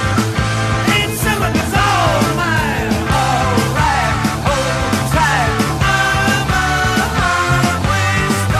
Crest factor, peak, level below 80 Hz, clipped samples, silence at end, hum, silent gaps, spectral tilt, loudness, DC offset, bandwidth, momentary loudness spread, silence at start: 14 dB; -2 dBFS; -28 dBFS; under 0.1%; 0 s; none; none; -4.5 dB/octave; -15 LUFS; under 0.1%; 15.5 kHz; 3 LU; 0 s